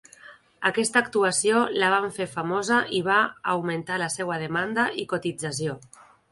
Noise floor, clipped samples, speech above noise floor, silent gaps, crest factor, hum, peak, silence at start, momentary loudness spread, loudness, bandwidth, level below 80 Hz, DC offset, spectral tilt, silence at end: -50 dBFS; under 0.1%; 25 dB; none; 20 dB; none; -6 dBFS; 0.25 s; 8 LU; -24 LUFS; 11.5 kHz; -66 dBFS; under 0.1%; -3.5 dB/octave; 0.55 s